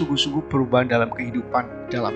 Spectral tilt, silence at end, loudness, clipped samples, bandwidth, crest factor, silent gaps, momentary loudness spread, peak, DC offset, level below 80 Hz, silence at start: -5.5 dB/octave; 0 s; -22 LUFS; under 0.1%; 9 kHz; 18 dB; none; 7 LU; -4 dBFS; under 0.1%; -50 dBFS; 0 s